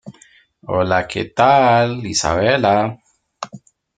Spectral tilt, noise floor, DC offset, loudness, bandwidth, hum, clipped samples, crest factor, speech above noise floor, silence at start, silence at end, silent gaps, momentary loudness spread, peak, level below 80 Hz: -4.5 dB/octave; -51 dBFS; under 0.1%; -16 LUFS; 9.4 kHz; none; under 0.1%; 16 dB; 35 dB; 0.05 s; 0.4 s; none; 20 LU; -2 dBFS; -46 dBFS